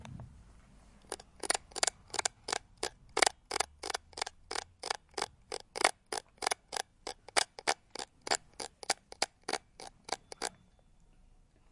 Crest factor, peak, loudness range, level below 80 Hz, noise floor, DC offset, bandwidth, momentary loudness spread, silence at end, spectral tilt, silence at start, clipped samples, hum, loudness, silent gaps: 32 dB; -8 dBFS; 4 LU; -64 dBFS; -64 dBFS; under 0.1%; 11.5 kHz; 14 LU; 1.2 s; -0.5 dB/octave; 0 s; under 0.1%; none; -36 LUFS; none